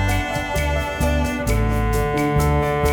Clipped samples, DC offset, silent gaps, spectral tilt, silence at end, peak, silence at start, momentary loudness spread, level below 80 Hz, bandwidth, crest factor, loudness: under 0.1%; under 0.1%; none; -6 dB/octave; 0 s; -6 dBFS; 0 s; 3 LU; -24 dBFS; over 20 kHz; 14 dB; -21 LUFS